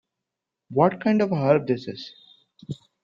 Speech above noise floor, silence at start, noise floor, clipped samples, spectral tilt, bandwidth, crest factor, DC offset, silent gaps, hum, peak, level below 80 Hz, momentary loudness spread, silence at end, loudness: 63 dB; 0.7 s; -85 dBFS; under 0.1%; -8.5 dB/octave; 7.6 kHz; 20 dB; under 0.1%; none; none; -4 dBFS; -64 dBFS; 18 LU; 0.3 s; -22 LUFS